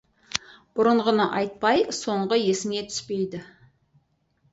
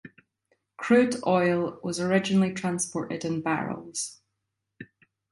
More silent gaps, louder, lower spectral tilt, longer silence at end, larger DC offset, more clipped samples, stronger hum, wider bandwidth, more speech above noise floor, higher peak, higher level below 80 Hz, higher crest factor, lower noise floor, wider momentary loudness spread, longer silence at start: neither; about the same, -24 LUFS vs -26 LUFS; about the same, -4 dB/octave vs -5 dB/octave; first, 1.05 s vs 0.5 s; neither; neither; neither; second, 8 kHz vs 11.5 kHz; second, 44 dB vs 56 dB; first, 0 dBFS vs -10 dBFS; about the same, -64 dBFS vs -68 dBFS; first, 26 dB vs 18 dB; second, -67 dBFS vs -82 dBFS; about the same, 10 LU vs 11 LU; first, 0.35 s vs 0.05 s